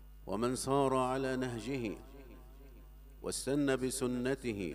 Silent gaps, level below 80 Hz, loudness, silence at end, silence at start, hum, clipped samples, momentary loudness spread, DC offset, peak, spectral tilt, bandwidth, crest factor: none; -54 dBFS; -35 LUFS; 0 s; 0 s; none; under 0.1%; 18 LU; under 0.1%; -18 dBFS; -5 dB/octave; 15.5 kHz; 18 dB